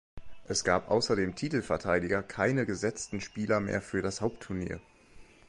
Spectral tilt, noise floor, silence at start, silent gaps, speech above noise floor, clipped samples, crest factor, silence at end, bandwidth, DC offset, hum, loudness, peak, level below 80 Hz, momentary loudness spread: -4.5 dB/octave; -54 dBFS; 0.15 s; none; 23 dB; under 0.1%; 20 dB; 0.25 s; 11.5 kHz; under 0.1%; none; -31 LUFS; -10 dBFS; -54 dBFS; 9 LU